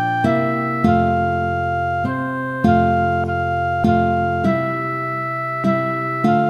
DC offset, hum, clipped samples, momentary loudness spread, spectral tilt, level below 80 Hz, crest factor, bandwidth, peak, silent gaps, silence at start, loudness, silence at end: under 0.1%; none; under 0.1%; 6 LU; -8.5 dB/octave; -40 dBFS; 18 dB; 12 kHz; -2 dBFS; none; 0 s; -19 LUFS; 0 s